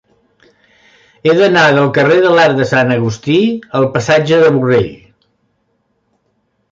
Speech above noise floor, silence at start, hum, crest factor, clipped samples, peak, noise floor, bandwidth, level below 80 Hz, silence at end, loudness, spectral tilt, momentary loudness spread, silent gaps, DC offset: 52 dB; 1.25 s; none; 12 dB; under 0.1%; 0 dBFS; -63 dBFS; 7.6 kHz; -50 dBFS; 1.75 s; -11 LUFS; -6 dB/octave; 7 LU; none; under 0.1%